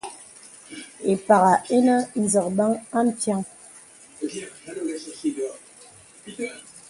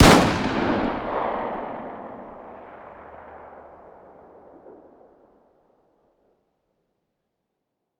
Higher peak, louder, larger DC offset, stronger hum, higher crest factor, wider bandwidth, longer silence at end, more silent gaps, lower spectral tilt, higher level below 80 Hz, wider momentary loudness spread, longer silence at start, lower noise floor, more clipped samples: about the same, -2 dBFS vs 0 dBFS; about the same, -23 LUFS vs -23 LUFS; neither; neither; about the same, 22 dB vs 26 dB; second, 11.5 kHz vs over 20 kHz; second, 0.1 s vs 4.4 s; neither; about the same, -5 dB/octave vs -5 dB/octave; second, -66 dBFS vs -40 dBFS; about the same, 24 LU vs 24 LU; about the same, 0.05 s vs 0 s; second, -49 dBFS vs -80 dBFS; neither